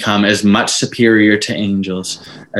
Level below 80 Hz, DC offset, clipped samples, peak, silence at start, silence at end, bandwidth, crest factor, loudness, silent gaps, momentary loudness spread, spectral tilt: -54 dBFS; under 0.1%; under 0.1%; 0 dBFS; 0 s; 0 s; 12.5 kHz; 14 dB; -13 LUFS; none; 11 LU; -4 dB/octave